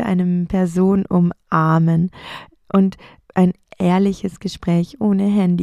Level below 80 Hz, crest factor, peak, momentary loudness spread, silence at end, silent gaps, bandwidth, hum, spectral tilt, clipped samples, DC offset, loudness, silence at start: -46 dBFS; 16 dB; -2 dBFS; 10 LU; 0 s; none; 10.5 kHz; none; -8.5 dB/octave; under 0.1%; under 0.1%; -18 LUFS; 0 s